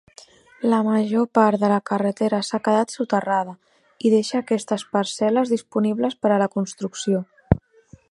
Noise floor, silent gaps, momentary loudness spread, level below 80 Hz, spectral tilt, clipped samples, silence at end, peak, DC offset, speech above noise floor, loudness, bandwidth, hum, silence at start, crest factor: -51 dBFS; none; 6 LU; -44 dBFS; -6 dB/octave; under 0.1%; 0.5 s; 0 dBFS; under 0.1%; 30 dB; -22 LUFS; 11.5 kHz; none; 0.6 s; 22 dB